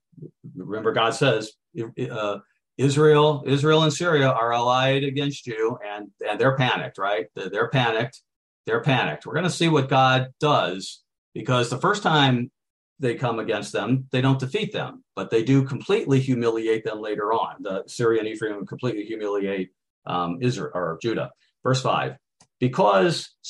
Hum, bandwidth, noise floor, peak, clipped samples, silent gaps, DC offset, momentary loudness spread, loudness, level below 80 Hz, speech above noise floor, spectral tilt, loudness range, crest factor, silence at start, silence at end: none; 11.5 kHz; -43 dBFS; -6 dBFS; under 0.1%; 8.36-8.64 s, 11.18-11.32 s, 12.70-12.96 s, 19.90-20.02 s; under 0.1%; 13 LU; -23 LUFS; -64 dBFS; 21 dB; -5.5 dB/octave; 6 LU; 18 dB; 0.15 s; 0 s